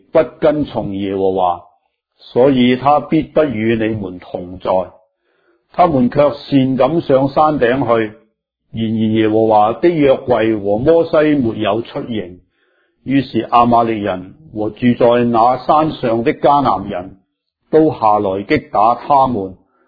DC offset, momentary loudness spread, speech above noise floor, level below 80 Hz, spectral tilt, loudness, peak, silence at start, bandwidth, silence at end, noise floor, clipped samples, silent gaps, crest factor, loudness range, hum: under 0.1%; 12 LU; 52 dB; -46 dBFS; -10 dB/octave; -14 LUFS; 0 dBFS; 0.15 s; 5 kHz; 0.35 s; -66 dBFS; under 0.1%; none; 14 dB; 3 LU; none